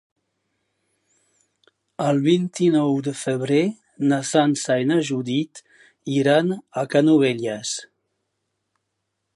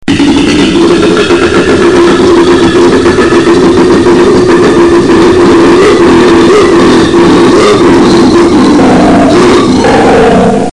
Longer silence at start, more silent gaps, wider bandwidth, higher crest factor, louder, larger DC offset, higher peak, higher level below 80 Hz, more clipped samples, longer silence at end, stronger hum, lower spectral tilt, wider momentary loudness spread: first, 2 s vs 0 s; neither; about the same, 11.5 kHz vs 10.5 kHz; first, 18 dB vs 4 dB; second, -21 LUFS vs -4 LUFS; neither; second, -4 dBFS vs 0 dBFS; second, -72 dBFS vs -26 dBFS; second, under 0.1% vs 5%; first, 1.5 s vs 0 s; neither; about the same, -5.5 dB/octave vs -5.5 dB/octave; first, 9 LU vs 2 LU